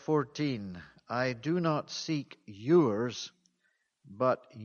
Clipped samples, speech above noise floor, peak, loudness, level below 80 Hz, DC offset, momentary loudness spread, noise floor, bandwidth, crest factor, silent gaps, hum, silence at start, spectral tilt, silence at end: under 0.1%; 46 dB; -14 dBFS; -31 LUFS; -72 dBFS; under 0.1%; 17 LU; -77 dBFS; 7 kHz; 18 dB; none; none; 0.1 s; -6 dB/octave; 0 s